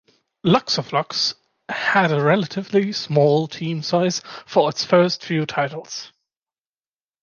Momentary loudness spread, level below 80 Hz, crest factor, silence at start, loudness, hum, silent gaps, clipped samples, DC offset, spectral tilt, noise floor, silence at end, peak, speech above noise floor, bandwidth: 9 LU; -64 dBFS; 18 dB; 0.45 s; -20 LUFS; none; none; under 0.1%; under 0.1%; -5 dB/octave; under -90 dBFS; 1.15 s; -2 dBFS; over 70 dB; 7.2 kHz